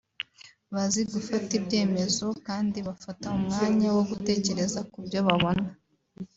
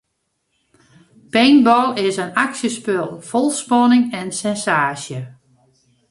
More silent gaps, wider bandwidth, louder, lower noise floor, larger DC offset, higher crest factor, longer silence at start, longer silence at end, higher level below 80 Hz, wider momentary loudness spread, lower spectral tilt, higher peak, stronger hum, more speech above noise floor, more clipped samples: neither; second, 8 kHz vs 11.5 kHz; second, -28 LUFS vs -17 LUFS; second, -55 dBFS vs -72 dBFS; neither; about the same, 20 dB vs 16 dB; second, 0.45 s vs 1.35 s; second, 0.1 s vs 0.8 s; about the same, -58 dBFS vs -62 dBFS; about the same, 13 LU vs 11 LU; about the same, -4.5 dB/octave vs -4 dB/octave; second, -8 dBFS vs -2 dBFS; neither; second, 28 dB vs 55 dB; neither